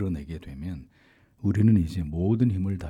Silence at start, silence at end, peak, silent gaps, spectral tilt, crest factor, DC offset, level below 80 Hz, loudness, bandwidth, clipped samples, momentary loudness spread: 0 s; 0 s; -10 dBFS; none; -9.5 dB/octave; 16 dB; under 0.1%; -46 dBFS; -25 LUFS; 11 kHz; under 0.1%; 16 LU